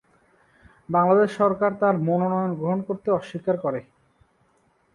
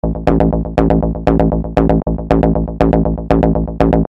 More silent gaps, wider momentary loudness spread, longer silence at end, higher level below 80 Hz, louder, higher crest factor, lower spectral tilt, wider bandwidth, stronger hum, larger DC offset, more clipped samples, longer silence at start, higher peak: neither; first, 8 LU vs 2 LU; first, 1.15 s vs 0 s; second, -64 dBFS vs -20 dBFS; second, -23 LUFS vs -14 LUFS; about the same, 18 dB vs 14 dB; second, -8.5 dB/octave vs -10 dB/octave; first, 11 kHz vs 5.8 kHz; neither; neither; second, under 0.1% vs 0.2%; first, 0.9 s vs 0.05 s; second, -6 dBFS vs 0 dBFS